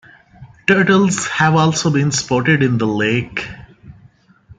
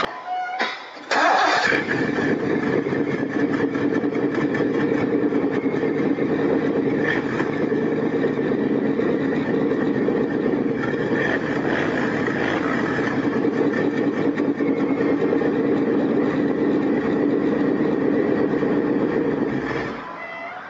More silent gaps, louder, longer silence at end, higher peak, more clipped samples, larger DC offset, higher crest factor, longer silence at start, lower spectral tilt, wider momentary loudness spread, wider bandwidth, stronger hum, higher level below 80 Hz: neither; first, -15 LUFS vs -21 LUFS; about the same, 0.05 s vs 0 s; first, -2 dBFS vs -6 dBFS; neither; neither; about the same, 16 dB vs 16 dB; first, 0.4 s vs 0 s; second, -5 dB/octave vs -6.5 dB/octave; first, 9 LU vs 3 LU; first, 9.4 kHz vs 7.8 kHz; neither; about the same, -50 dBFS vs -54 dBFS